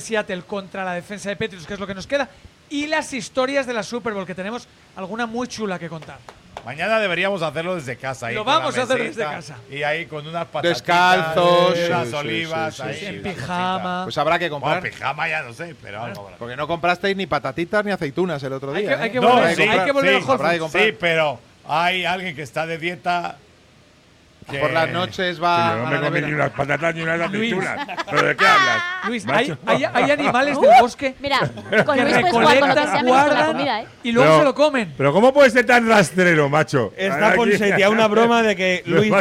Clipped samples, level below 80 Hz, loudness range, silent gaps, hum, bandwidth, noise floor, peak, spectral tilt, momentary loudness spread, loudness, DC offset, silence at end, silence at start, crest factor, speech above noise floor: under 0.1%; -56 dBFS; 9 LU; none; none; 16 kHz; -52 dBFS; -4 dBFS; -4.5 dB/octave; 14 LU; -19 LUFS; under 0.1%; 0 s; 0 s; 16 dB; 33 dB